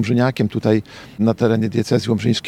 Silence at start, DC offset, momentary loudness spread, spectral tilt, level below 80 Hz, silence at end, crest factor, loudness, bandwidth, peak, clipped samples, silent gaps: 0 s; under 0.1%; 4 LU; -7 dB/octave; -54 dBFS; 0 s; 16 dB; -18 LUFS; 13.5 kHz; -2 dBFS; under 0.1%; none